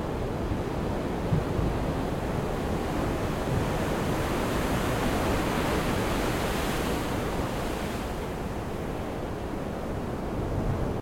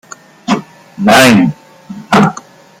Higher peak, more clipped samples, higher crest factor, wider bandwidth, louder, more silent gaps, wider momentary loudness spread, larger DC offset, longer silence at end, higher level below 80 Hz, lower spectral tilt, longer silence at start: second, -14 dBFS vs 0 dBFS; neither; about the same, 16 dB vs 12 dB; about the same, 17 kHz vs 16.5 kHz; second, -30 LUFS vs -10 LUFS; neither; second, 6 LU vs 25 LU; neither; second, 0 s vs 0.4 s; first, -36 dBFS vs -48 dBFS; first, -6 dB/octave vs -4.5 dB/octave; second, 0 s vs 0.5 s